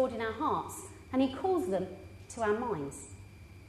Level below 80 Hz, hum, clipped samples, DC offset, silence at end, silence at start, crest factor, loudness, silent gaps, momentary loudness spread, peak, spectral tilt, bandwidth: -58 dBFS; none; under 0.1%; under 0.1%; 0 s; 0 s; 16 dB; -33 LUFS; none; 18 LU; -18 dBFS; -5.5 dB/octave; 13.5 kHz